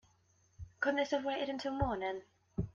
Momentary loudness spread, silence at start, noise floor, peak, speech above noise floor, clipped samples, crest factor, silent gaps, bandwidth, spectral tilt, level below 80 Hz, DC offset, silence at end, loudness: 13 LU; 0.6 s; -71 dBFS; -18 dBFS; 35 dB; under 0.1%; 20 dB; none; 7.4 kHz; -6 dB/octave; -54 dBFS; under 0.1%; 0.05 s; -37 LUFS